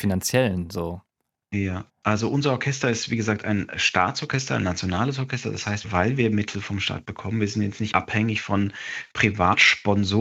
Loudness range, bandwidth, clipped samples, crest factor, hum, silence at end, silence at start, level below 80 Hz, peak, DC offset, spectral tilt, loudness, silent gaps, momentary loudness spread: 3 LU; 16 kHz; under 0.1%; 22 dB; none; 0 s; 0 s; -56 dBFS; -2 dBFS; under 0.1%; -5 dB/octave; -23 LUFS; none; 9 LU